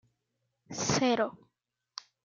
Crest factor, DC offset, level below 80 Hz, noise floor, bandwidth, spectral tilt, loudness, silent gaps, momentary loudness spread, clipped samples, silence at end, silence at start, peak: 20 dB; under 0.1%; -68 dBFS; -83 dBFS; 9.4 kHz; -3.5 dB/octave; -30 LUFS; none; 19 LU; under 0.1%; 0.95 s; 0.7 s; -14 dBFS